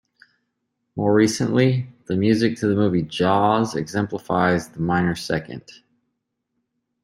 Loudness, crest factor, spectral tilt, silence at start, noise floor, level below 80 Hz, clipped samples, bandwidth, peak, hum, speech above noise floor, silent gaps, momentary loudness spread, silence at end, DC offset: -21 LUFS; 18 dB; -6 dB/octave; 0.95 s; -76 dBFS; -56 dBFS; under 0.1%; 15 kHz; -4 dBFS; none; 56 dB; none; 9 LU; 1.35 s; under 0.1%